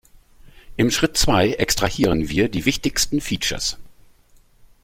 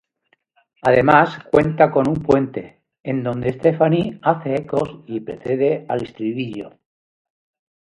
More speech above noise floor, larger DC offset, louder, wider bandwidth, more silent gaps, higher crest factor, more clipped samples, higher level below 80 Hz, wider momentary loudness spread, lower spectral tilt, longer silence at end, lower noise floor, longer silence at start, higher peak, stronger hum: second, 33 dB vs 47 dB; neither; about the same, -20 LUFS vs -19 LUFS; first, 16.5 kHz vs 11 kHz; second, none vs 3.00-3.04 s; about the same, 18 dB vs 20 dB; neither; first, -36 dBFS vs -52 dBFS; second, 7 LU vs 14 LU; second, -3.5 dB/octave vs -8 dB/octave; second, 0.9 s vs 1.25 s; second, -53 dBFS vs -65 dBFS; second, 0.45 s vs 0.85 s; about the same, -2 dBFS vs 0 dBFS; neither